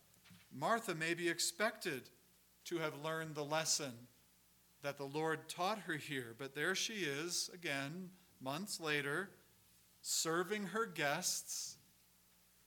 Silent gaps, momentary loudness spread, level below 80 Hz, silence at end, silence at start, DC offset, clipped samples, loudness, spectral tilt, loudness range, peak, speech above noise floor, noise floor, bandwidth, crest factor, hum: none; 12 LU; -84 dBFS; 0.9 s; 0.25 s; under 0.1%; under 0.1%; -40 LUFS; -2.5 dB/octave; 2 LU; -22 dBFS; 30 dB; -71 dBFS; 19 kHz; 22 dB; none